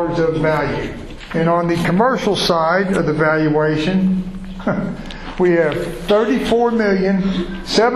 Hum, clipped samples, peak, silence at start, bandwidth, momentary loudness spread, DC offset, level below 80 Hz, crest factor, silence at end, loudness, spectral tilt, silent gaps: none; under 0.1%; -2 dBFS; 0 s; 12.5 kHz; 10 LU; under 0.1%; -36 dBFS; 14 dB; 0 s; -17 LUFS; -6 dB/octave; none